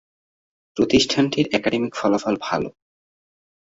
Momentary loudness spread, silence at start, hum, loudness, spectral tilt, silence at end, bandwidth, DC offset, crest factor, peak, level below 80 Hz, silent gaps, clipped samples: 9 LU; 0.75 s; none; -21 LUFS; -4.5 dB/octave; 1.1 s; 8 kHz; under 0.1%; 20 dB; -4 dBFS; -52 dBFS; none; under 0.1%